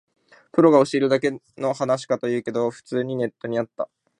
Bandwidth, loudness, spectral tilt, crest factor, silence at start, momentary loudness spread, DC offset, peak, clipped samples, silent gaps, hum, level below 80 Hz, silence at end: 11 kHz; -22 LUFS; -6.5 dB/octave; 20 dB; 0.55 s; 11 LU; under 0.1%; -2 dBFS; under 0.1%; none; none; -70 dBFS; 0.35 s